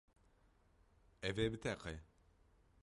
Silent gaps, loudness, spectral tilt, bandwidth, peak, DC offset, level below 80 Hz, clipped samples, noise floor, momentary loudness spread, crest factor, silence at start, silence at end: none; -43 LUFS; -5.5 dB/octave; 11.5 kHz; -26 dBFS; under 0.1%; -62 dBFS; under 0.1%; -72 dBFS; 11 LU; 22 dB; 1.2 s; 0.8 s